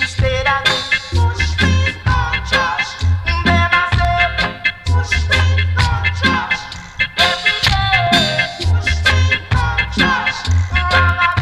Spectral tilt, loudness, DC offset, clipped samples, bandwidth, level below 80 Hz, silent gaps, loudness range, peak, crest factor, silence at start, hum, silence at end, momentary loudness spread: -4.5 dB/octave; -15 LUFS; under 0.1%; under 0.1%; 12 kHz; -24 dBFS; none; 1 LU; 0 dBFS; 16 dB; 0 s; none; 0 s; 5 LU